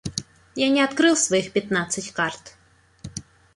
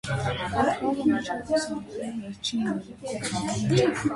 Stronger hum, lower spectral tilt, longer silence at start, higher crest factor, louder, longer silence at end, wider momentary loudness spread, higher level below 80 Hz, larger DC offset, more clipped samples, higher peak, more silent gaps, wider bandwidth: neither; second, -3 dB/octave vs -5 dB/octave; about the same, 0.05 s vs 0.05 s; about the same, 18 dB vs 20 dB; first, -22 LUFS vs -27 LUFS; first, 0.35 s vs 0 s; first, 19 LU vs 11 LU; second, -56 dBFS vs -50 dBFS; neither; neither; about the same, -6 dBFS vs -8 dBFS; neither; about the same, 11.5 kHz vs 11.5 kHz